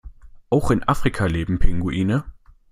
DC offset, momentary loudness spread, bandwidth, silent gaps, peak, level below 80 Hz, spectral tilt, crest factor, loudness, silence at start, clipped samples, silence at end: under 0.1%; 4 LU; 12 kHz; none; -2 dBFS; -28 dBFS; -7 dB/octave; 18 dB; -22 LUFS; 0.05 s; under 0.1%; 0.4 s